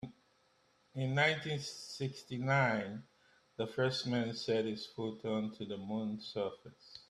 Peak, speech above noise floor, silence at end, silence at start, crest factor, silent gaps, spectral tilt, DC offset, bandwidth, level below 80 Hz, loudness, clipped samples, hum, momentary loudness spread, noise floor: -18 dBFS; 36 dB; 0.1 s; 0 s; 20 dB; none; -5.5 dB/octave; under 0.1%; 12 kHz; -74 dBFS; -37 LUFS; under 0.1%; none; 15 LU; -72 dBFS